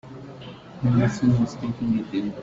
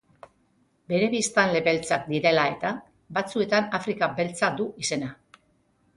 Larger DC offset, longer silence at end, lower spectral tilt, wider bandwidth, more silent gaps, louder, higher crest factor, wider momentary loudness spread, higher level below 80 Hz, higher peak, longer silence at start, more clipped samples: neither; second, 0 s vs 0.8 s; first, -8 dB/octave vs -4 dB/octave; second, 7.8 kHz vs 11.5 kHz; neither; about the same, -23 LUFS vs -25 LUFS; second, 14 dB vs 22 dB; first, 20 LU vs 9 LU; first, -50 dBFS vs -64 dBFS; second, -10 dBFS vs -4 dBFS; second, 0.05 s vs 0.9 s; neither